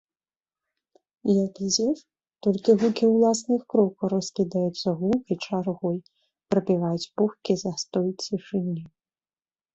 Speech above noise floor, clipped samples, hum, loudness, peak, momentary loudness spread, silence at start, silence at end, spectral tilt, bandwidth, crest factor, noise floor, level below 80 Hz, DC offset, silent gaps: over 66 dB; under 0.1%; none; -25 LUFS; -8 dBFS; 8 LU; 1.25 s; 0.9 s; -5.5 dB/octave; 8.2 kHz; 18 dB; under -90 dBFS; -66 dBFS; under 0.1%; none